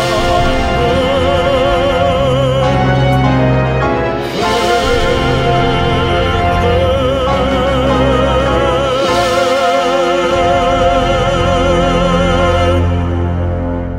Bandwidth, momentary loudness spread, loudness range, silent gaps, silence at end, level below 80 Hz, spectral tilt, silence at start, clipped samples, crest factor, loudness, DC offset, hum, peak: 15.5 kHz; 2 LU; 1 LU; none; 0 s; -22 dBFS; -6 dB/octave; 0 s; under 0.1%; 12 dB; -12 LUFS; under 0.1%; none; 0 dBFS